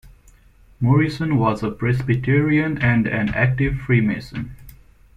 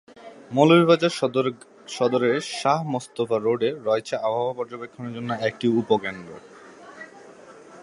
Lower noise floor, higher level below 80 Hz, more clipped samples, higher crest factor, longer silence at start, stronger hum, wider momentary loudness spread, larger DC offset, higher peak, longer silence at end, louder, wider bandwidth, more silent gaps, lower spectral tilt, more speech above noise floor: first, -50 dBFS vs -46 dBFS; first, -40 dBFS vs -68 dBFS; neither; about the same, 16 dB vs 20 dB; about the same, 0.05 s vs 0.15 s; neither; second, 7 LU vs 23 LU; neither; about the same, -4 dBFS vs -2 dBFS; first, 0.45 s vs 0 s; first, -19 LUFS vs -23 LUFS; second, 7.4 kHz vs 11.5 kHz; neither; first, -8.5 dB/octave vs -5.5 dB/octave; first, 32 dB vs 24 dB